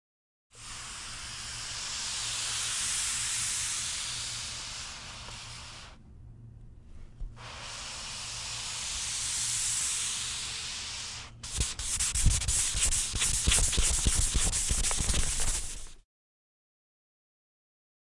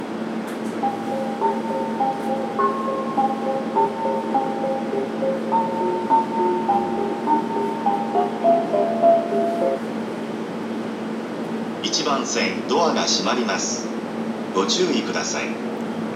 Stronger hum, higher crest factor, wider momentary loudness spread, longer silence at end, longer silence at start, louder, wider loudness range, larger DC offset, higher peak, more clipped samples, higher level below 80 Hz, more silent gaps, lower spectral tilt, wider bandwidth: neither; first, 22 dB vs 16 dB; first, 15 LU vs 9 LU; first, 2 s vs 0 s; first, 0.55 s vs 0 s; second, -30 LUFS vs -22 LUFS; first, 14 LU vs 3 LU; neither; second, -10 dBFS vs -6 dBFS; neither; first, -38 dBFS vs -70 dBFS; neither; second, -1 dB/octave vs -4 dB/octave; second, 11.5 kHz vs 14 kHz